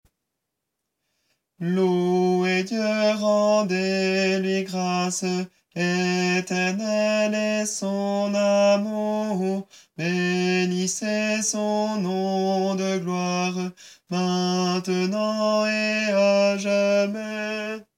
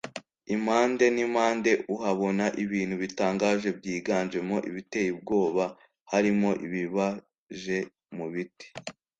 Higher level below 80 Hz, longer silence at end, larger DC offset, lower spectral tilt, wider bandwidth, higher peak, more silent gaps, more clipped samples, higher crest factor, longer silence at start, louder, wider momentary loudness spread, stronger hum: second, -76 dBFS vs -66 dBFS; second, 0.15 s vs 0.3 s; neither; about the same, -4.5 dB/octave vs -5.5 dB/octave; first, 14.5 kHz vs 9.2 kHz; about the same, -10 dBFS vs -10 dBFS; second, none vs 6.01-6.06 s, 7.38-7.47 s; neither; about the same, 14 dB vs 18 dB; first, 1.6 s vs 0.05 s; first, -23 LUFS vs -28 LUFS; second, 7 LU vs 15 LU; neither